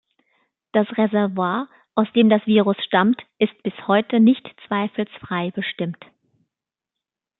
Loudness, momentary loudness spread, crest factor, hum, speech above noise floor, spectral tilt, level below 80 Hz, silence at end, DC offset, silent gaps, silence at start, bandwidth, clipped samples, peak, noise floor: -20 LUFS; 11 LU; 18 dB; none; 67 dB; -10.5 dB/octave; -68 dBFS; 1.45 s; under 0.1%; none; 0.75 s; 4.1 kHz; under 0.1%; -2 dBFS; -86 dBFS